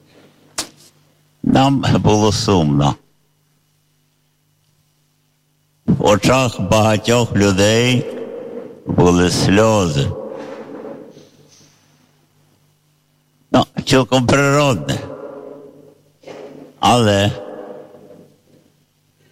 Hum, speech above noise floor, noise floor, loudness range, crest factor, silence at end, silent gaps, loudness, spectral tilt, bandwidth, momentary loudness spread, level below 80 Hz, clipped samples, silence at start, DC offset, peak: none; 48 dB; -61 dBFS; 9 LU; 14 dB; 1.5 s; none; -15 LUFS; -5.5 dB/octave; 16 kHz; 21 LU; -42 dBFS; under 0.1%; 0.6 s; under 0.1%; -4 dBFS